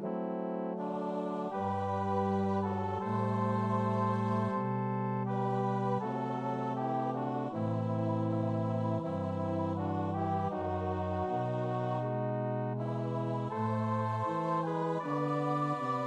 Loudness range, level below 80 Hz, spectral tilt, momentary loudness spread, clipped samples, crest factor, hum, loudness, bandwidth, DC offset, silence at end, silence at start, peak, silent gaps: 2 LU; -68 dBFS; -9 dB/octave; 4 LU; under 0.1%; 14 dB; none; -34 LUFS; 8.8 kHz; under 0.1%; 0 s; 0 s; -20 dBFS; none